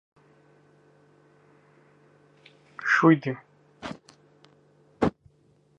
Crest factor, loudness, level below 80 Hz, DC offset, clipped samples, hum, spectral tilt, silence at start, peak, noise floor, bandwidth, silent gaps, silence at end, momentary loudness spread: 26 dB; -24 LUFS; -60 dBFS; under 0.1%; under 0.1%; 50 Hz at -60 dBFS; -7 dB/octave; 2.8 s; -4 dBFS; -63 dBFS; 8.2 kHz; none; 0.7 s; 23 LU